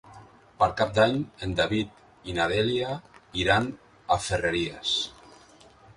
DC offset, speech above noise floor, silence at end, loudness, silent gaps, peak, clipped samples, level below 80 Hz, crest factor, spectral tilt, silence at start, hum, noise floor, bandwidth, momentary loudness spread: under 0.1%; 28 dB; 0.85 s; -26 LUFS; none; -6 dBFS; under 0.1%; -48 dBFS; 22 dB; -4.5 dB/octave; 0.05 s; none; -54 dBFS; 11.5 kHz; 12 LU